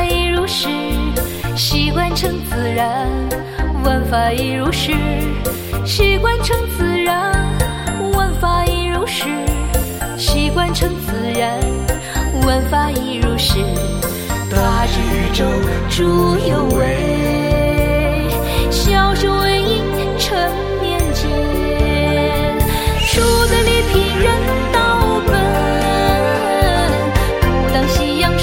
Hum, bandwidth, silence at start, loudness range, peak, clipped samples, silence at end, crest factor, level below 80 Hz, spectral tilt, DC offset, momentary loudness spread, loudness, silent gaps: none; 17 kHz; 0 s; 3 LU; 0 dBFS; under 0.1%; 0 s; 14 dB; -22 dBFS; -5 dB/octave; under 0.1%; 6 LU; -16 LUFS; none